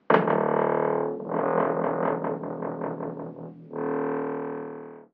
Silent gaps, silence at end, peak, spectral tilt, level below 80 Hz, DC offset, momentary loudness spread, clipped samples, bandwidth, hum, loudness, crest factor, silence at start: none; 0.1 s; -4 dBFS; -6 dB/octave; -78 dBFS; under 0.1%; 14 LU; under 0.1%; 4.8 kHz; none; -27 LUFS; 24 dB; 0.1 s